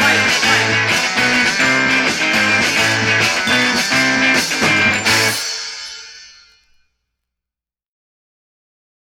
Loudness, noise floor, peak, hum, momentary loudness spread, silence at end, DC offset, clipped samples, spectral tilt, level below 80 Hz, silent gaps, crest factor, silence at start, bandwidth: -13 LUFS; -88 dBFS; -2 dBFS; 60 Hz at -60 dBFS; 8 LU; 2.75 s; under 0.1%; under 0.1%; -2 dB/octave; -52 dBFS; none; 16 dB; 0 s; 17 kHz